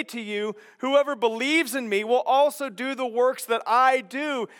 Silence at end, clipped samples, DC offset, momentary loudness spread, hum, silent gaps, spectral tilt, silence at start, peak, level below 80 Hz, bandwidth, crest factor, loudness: 0.15 s; under 0.1%; under 0.1%; 10 LU; none; none; -3 dB/octave; 0 s; -8 dBFS; under -90 dBFS; 17.5 kHz; 16 dB; -24 LUFS